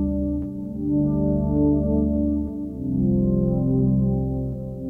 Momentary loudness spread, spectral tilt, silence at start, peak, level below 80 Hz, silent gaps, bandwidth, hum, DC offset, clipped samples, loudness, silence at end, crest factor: 8 LU; -13.5 dB/octave; 0 s; -10 dBFS; -32 dBFS; none; 1.6 kHz; none; under 0.1%; under 0.1%; -23 LUFS; 0 s; 12 dB